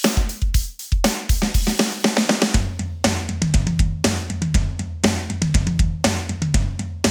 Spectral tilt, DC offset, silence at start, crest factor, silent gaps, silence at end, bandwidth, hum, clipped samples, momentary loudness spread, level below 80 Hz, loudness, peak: -4.5 dB/octave; under 0.1%; 0 s; 18 dB; none; 0 s; over 20 kHz; none; under 0.1%; 4 LU; -24 dBFS; -21 LUFS; -2 dBFS